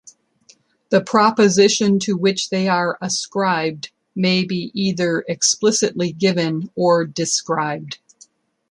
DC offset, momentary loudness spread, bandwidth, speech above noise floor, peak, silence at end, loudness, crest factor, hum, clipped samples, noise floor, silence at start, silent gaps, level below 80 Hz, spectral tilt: under 0.1%; 9 LU; 11.5 kHz; 36 dB; -2 dBFS; 0.75 s; -18 LUFS; 18 dB; none; under 0.1%; -54 dBFS; 0.9 s; none; -64 dBFS; -4 dB/octave